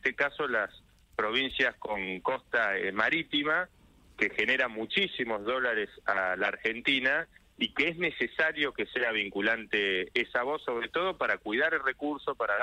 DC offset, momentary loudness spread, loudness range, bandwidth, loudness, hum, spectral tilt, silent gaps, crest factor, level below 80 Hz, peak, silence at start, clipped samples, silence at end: under 0.1%; 6 LU; 1 LU; 12.5 kHz; -29 LUFS; none; -4.5 dB/octave; none; 18 dB; -62 dBFS; -12 dBFS; 0.05 s; under 0.1%; 0 s